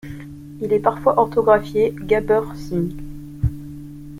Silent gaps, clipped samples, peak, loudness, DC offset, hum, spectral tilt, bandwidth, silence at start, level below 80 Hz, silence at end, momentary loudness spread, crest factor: none; under 0.1%; -2 dBFS; -20 LUFS; under 0.1%; none; -8 dB/octave; 15.5 kHz; 0.05 s; -36 dBFS; 0 s; 19 LU; 18 dB